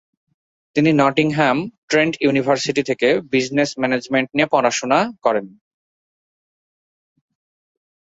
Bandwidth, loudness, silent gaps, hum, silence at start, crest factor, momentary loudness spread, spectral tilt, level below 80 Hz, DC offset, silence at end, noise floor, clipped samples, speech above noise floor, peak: 8 kHz; -18 LUFS; 1.78-1.88 s; none; 0.75 s; 18 dB; 5 LU; -5 dB/octave; -60 dBFS; under 0.1%; 2.55 s; under -90 dBFS; under 0.1%; over 72 dB; -2 dBFS